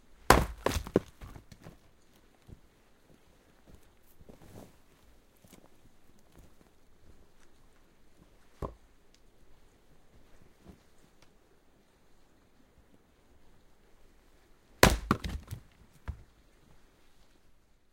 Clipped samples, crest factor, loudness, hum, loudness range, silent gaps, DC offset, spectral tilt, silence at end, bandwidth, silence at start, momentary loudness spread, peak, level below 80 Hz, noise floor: under 0.1%; 34 dB; -30 LUFS; none; 26 LU; none; under 0.1%; -4 dB/octave; 1.75 s; 16 kHz; 0.3 s; 31 LU; -4 dBFS; -46 dBFS; -63 dBFS